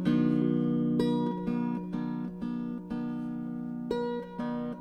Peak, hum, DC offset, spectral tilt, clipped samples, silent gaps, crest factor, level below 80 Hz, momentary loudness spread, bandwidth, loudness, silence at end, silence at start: -14 dBFS; none; under 0.1%; -9 dB/octave; under 0.1%; none; 16 dB; -60 dBFS; 9 LU; 8.8 kHz; -31 LUFS; 0 s; 0 s